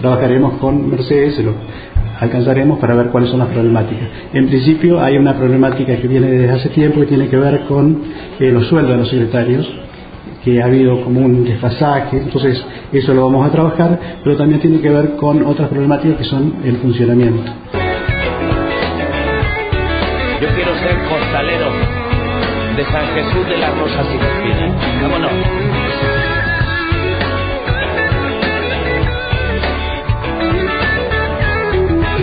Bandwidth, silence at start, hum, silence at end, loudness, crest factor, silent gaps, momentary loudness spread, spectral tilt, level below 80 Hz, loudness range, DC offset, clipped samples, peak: 5 kHz; 0 s; none; 0 s; -14 LUFS; 14 dB; none; 6 LU; -11 dB/octave; -28 dBFS; 4 LU; under 0.1%; under 0.1%; 0 dBFS